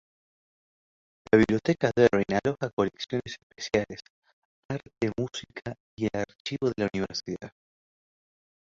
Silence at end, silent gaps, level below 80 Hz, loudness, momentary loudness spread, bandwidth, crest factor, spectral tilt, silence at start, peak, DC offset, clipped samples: 1.15 s; 2.73-2.77 s, 3.43-3.50 s, 4.10-4.22 s, 4.33-4.69 s, 5.80-5.97 s, 6.40-6.45 s; -56 dBFS; -28 LUFS; 17 LU; 7.8 kHz; 24 dB; -6 dB/octave; 1.35 s; -6 dBFS; under 0.1%; under 0.1%